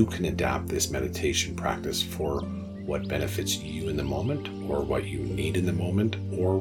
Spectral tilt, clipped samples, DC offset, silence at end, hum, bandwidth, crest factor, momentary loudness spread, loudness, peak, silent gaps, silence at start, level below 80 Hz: -5 dB/octave; under 0.1%; under 0.1%; 0 s; none; 18 kHz; 20 dB; 5 LU; -29 LUFS; -8 dBFS; none; 0 s; -44 dBFS